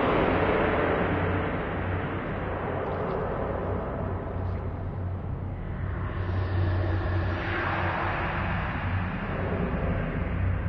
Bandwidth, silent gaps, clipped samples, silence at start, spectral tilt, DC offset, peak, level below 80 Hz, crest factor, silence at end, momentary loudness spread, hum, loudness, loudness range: 5.4 kHz; none; under 0.1%; 0 s; -9.5 dB/octave; under 0.1%; -12 dBFS; -38 dBFS; 16 dB; 0 s; 9 LU; none; -29 LUFS; 4 LU